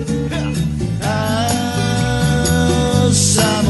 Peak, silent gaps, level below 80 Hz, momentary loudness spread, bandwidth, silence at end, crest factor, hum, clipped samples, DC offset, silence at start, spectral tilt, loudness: -2 dBFS; none; -30 dBFS; 7 LU; 12 kHz; 0 s; 14 dB; none; under 0.1%; under 0.1%; 0 s; -4.5 dB/octave; -16 LUFS